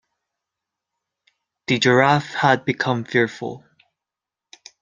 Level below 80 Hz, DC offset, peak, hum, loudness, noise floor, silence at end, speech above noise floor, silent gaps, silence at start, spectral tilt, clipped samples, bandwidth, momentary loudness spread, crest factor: -64 dBFS; under 0.1%; -2 dBFS; none; -19 LUFS; -87 dBFS; 1.25 s; 68 dB; none; 1.7 s; -5 dB/octave; under 0.1%; 9.4 kHz; 17 LU; 22 dB